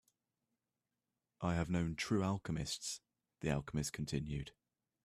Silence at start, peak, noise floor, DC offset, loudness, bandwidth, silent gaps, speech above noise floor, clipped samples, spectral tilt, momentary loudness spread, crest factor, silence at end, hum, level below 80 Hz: 1.4 s; -22 dBFS; under -90 dBFS; under 0.1%; -40 LUFS; 14.5 kHz; none; over 51 dB; under 0.1%; -5 dB/octave; 8 LU; 20 dB; 0.55 s; none; -58 dBFS